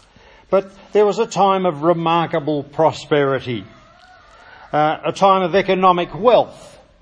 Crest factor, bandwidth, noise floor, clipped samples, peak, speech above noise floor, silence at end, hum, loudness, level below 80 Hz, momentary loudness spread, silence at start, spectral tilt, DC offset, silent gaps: 18 dB; 10 kHz; -48 dBFS; under 0.1%; 0 dBFS; 31 dB; 0.35 s; none; -17 LUFS; -54 dBFS; 8 LU; 0.5 s; -6 dB/octave; under 0.1%; none